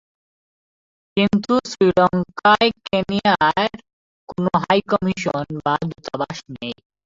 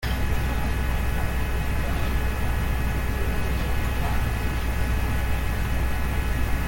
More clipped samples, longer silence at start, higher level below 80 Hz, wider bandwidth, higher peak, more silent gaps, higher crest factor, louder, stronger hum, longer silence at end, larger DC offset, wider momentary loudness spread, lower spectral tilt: neither; first, 1.15 s vs 0 s; second, -52 dBFS vs -26 dBFS; second, 7.8 kHz vs 17 kHz; first, -4 dBFS vs -12 dBFS; first, 3.93-4.27 s vs none; about the same, 16 dB vs 12 dB; first, -19 LUFS vs -27 LUFS; neither; first, 0.3 s vs 0 s; neither; first, 12 LU vs 1 LU; about the same, -5.5 dB/octave vs -5.5 dB/octave